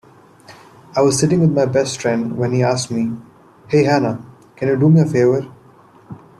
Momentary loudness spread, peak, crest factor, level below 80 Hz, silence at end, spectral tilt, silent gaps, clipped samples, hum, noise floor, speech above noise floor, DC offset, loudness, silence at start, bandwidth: 11 LU; -2 dBFS; 16 dB; -56 dBFS; 0.2 s; -6 dB/octave; none; under 0.1%; none; -47 dBFS; 31 dB; under 0.1%; -16 LUFS; 0.5 s; 12 kHz